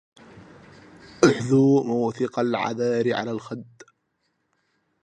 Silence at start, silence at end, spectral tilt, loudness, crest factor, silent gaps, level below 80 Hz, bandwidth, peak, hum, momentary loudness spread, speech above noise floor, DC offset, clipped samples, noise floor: 0.35 s; 1.4 s; -6.5 dB/octave; -22 LUFS; 22 dB; none; -62 dBFS; 9.6 kHz; -2 dBFS; none; 13 LU; 51 dB; under 0.1%; under 0.1%; -73 dBFS